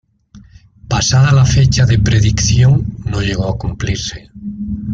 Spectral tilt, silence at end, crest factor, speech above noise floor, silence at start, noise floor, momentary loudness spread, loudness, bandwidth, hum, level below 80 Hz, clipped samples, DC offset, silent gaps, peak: -5 dB/octave; 0 s; 12 dB; 30 dB; 0.35 s; -42 dBFS; 14 LU; -13 LUFS; 7.8 kHz; none; -26 dBFS; under 0.1%; under 0.1%; none; -2 dBFS